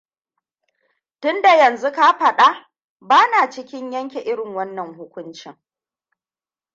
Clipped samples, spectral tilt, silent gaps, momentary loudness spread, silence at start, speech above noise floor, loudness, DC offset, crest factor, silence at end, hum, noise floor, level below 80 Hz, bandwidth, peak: under 0.1%; -3 dB/octave; 2.84-2.96 s; 21 LU; 1.2 s; over 73 dB; -16 LUFS; under 0.1%; 18 dB; 1.25 s; none; under -90 dBFS; -76 dBFS; 7.8 kHz; -2 dBFS